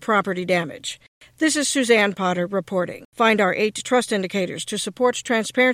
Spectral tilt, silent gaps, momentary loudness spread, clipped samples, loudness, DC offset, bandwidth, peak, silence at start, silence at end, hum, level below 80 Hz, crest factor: -3.5 dB/octave; 1.08-1.21 s, 3.05-3.12 s; 9 LU; under 0.1%; -21 LUFS; under 0.1%; 16 kHz; -4 dBFS; 0 s; 0 s; none; -66 dBFS; 16 dB